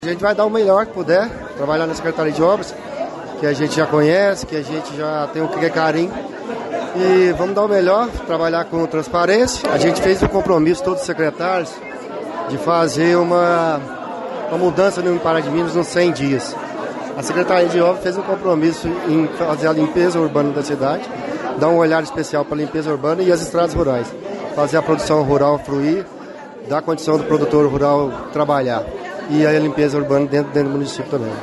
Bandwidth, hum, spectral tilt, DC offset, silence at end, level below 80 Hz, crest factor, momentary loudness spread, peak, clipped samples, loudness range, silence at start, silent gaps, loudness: 11.5 kHz; none; -6 dB/octave; under 0.1%; 0 s; -44 dBFS; 14 dB; 11 LU; -2 dBFS; under 0.1%; 2 LU; 0 s; none; -17 LUFS